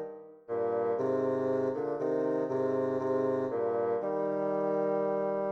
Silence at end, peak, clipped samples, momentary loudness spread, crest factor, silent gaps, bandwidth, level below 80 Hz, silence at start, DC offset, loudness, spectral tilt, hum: 0 s; -18 dBFS; under 0.1%; 3 LU; 12 dB; none; 6.6 kHz; -76 dBFS; 0 s; under 0.1%; -31 LUFS; -9 dB/octave; none